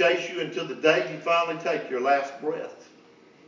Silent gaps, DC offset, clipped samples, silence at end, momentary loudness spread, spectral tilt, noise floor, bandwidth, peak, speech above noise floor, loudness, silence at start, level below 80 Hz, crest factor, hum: none; under 0.1%; under 0.1%; 0.65 s; 9 LU; -4 dB/octave; -54 dBFS; 7.6 kHz; -4 dBFS; 28 dB; -26 LUFS; 0 s; -86 dBFS; 22 dB; none